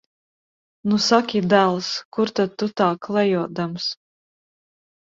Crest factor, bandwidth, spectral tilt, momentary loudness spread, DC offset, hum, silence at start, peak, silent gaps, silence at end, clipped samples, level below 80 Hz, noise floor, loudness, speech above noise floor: 20 dB; 7.8 kHz; -5 dB/octave; 10 LU; under 0.1%; none; 0.85 s; -2 dBFS; 2.05-2.12 s; 1.1 s; under 0.1%; -64 dBFS; under -90 dBFS; -21 LUFS; over 70 dB